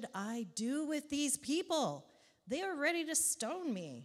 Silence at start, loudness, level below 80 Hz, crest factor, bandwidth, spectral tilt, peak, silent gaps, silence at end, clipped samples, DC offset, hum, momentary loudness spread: 0 s; -36 LUFS; -80 dBFS; 18 dB; 16.5 kHz; -2.5 dB/octave; -20 dBFS; none; 0 s; under 0.1%; under 0.1%; none; 9 LU